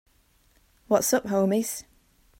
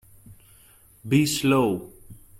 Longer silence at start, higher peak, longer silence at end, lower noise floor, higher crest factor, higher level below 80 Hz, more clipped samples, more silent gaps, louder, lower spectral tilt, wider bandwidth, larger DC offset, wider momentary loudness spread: first, 0.9 s vs 0.3 s; about the same, -8 dBFS vs -8 dBFS; first, 0.6 s vs 0.25 s; first, -63 dBFS vs -54 dBFS; about the same, 20 dB vs 18 dB; second, -62 dBFS vs -56 dBFS; neither; neither; about the same, -25 LUFS vs -23 LUFS; about the same, -4.5 dB/octave vs -5 dB/octave; about the same, 16.5 kHz vs 16.5 kHz; neither; second, 9 LU vs 22 LU